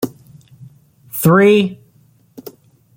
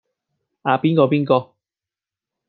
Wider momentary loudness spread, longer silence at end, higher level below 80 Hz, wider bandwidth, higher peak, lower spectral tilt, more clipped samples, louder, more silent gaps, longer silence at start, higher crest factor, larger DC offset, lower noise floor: first, 27 LU vs 5 LU; first, 1.2 s vs 1.05 s; first, -56 dBFS vs -68 dBFS; first, 17 kHz vs 4.8 kHz; about the same, -2 dBFS vs -2 dBFS; second, -6 dB/octave vs -10.5 dB/octave; neither; first, -13 LUFS vs -18 LUFS; neither; second, 0 s vs 0.65 s; about the same, 16 dB vs 20 dB; neither; second, -52 dBFS vs -90 dBFS